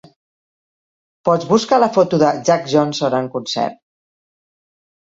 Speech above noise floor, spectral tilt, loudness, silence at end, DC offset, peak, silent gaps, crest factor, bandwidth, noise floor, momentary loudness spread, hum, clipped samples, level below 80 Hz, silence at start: over 74 dB; -5.5 dB/octave; -16 LUFS; 1.3 s; under 0.1%; 0 dBFS; none; 18 dB; 7.8 kHz; under -90 dBFS; 8 LU; none; under 0.1%; -62 dBFS; 1.25 s